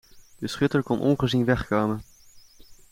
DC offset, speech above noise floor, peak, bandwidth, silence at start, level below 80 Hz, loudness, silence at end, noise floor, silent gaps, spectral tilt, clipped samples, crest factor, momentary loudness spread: under 0.1%; 28 dB; -8 dBFS; 16.5 kHz; 0.15 s; -48 dBFS; -25 LUFS; 0.2 s; -51 dBFS; none; -6.5 dB/octave; under 0.1%; 18 dB; 12 LU